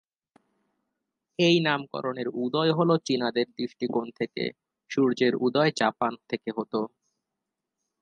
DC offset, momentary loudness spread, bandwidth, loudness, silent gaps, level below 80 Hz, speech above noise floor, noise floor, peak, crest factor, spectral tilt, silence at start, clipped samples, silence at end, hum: under 0.1%; 10 LU; 9.6 kHz; -26 LUFS; none; -76 dBFS; 59 dB; -85 dBFS; -8 dBFS; 20 dB; -5.5 dB/octave; 1.4 s; under 0.1%; 1.15 s; none